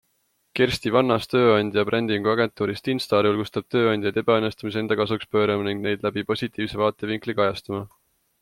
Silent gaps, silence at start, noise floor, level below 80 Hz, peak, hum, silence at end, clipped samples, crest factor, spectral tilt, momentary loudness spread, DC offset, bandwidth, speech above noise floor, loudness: none; 0.55 s; -70 dBFS; -56 dBFS; -4 dBFS; none; 0.55 s; under 0.1%; 18 dB; -6 dB/octave; 7 LU; under 0.1%; 15.5 kHz; 47 dB; -23 LUFS